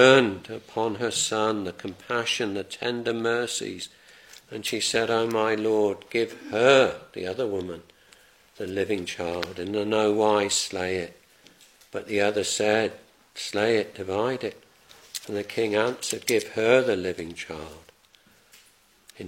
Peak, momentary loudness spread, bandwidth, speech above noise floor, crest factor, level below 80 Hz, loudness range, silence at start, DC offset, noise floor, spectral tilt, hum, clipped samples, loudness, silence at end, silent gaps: -2 dBFS; 16 LU; 16.5 kHz; 34 dB; 24 dB; -64 dBFS; 4 LU; 0 s; under 0.1%; -59 dBFS; -3.5 dB/octave; none; under 0.1%; -25 LUFS; 0 s; none